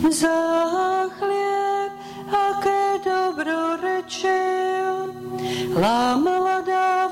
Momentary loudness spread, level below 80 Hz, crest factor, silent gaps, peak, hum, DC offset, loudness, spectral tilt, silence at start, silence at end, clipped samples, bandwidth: 7 LU; -56 dBFS; 10 dB; none; -10 dBFS; none; under 0.1%; -22 LUFS; -4 dB/octave; 0 s; 0 s; under 0.1%; 16.5 kHz